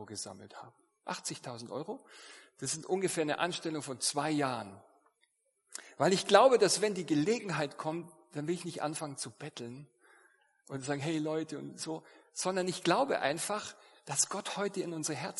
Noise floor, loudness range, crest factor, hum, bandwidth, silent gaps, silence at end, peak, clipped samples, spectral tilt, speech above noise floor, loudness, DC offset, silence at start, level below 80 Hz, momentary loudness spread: -76 dBFS; 10 LU; 28 dB; none; 11.5 kHz; none; 0 s; -6 dBFS; under 0.1%; -3.5 dB/octave; 43 dB; -33 LUFS; under 0.1%; 0 s; -82 dBFS; 17 LU